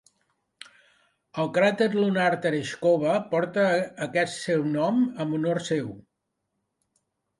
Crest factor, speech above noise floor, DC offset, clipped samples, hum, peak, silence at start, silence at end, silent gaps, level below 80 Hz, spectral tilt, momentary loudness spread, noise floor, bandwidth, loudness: 18 dB; 55 dB; under 0.1%; under 0.1%; none; -10 dBFS; 1.35 s; 1.4 s; none; -70 dBFS; -6 dB/octave; 6 LU; -80 dBFS; 11.5 kHz; -25 LUFS